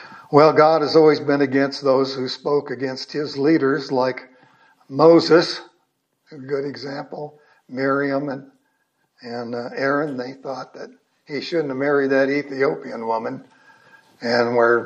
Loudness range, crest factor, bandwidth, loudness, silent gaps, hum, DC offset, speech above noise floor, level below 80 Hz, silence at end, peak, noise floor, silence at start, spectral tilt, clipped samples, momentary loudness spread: 9 LU; 20 dB; 8.4 kHz; -19 LUFS; none; none; under 0.1%; 50 dB; -76 dBFS; 0 s; 0 dBFS; -69 dBFS; 0 s; -6 dB/octave; under 0.1%; 18 LU